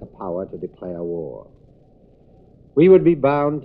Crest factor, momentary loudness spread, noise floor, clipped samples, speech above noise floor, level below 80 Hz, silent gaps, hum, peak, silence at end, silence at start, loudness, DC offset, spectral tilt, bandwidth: 18 dB; 19 LU; -51 dBFS; under 0.1%; 33 dB; -52 dBFS; none; none; -2 dBFS; 0 s; 0 s; -18 LUFS; under 0.1%; -12 dB/octave; 4.1 kHz